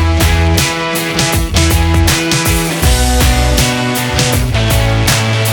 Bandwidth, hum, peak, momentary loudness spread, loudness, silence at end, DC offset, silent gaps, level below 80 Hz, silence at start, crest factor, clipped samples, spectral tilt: over 20 kHz; none; 0 dBFS; 2 LU; -12 LUFS; 0 s; under 0.1%; none; -16 dBFS; 0 s; 12 dB; under 0.1%; -4 dB/octave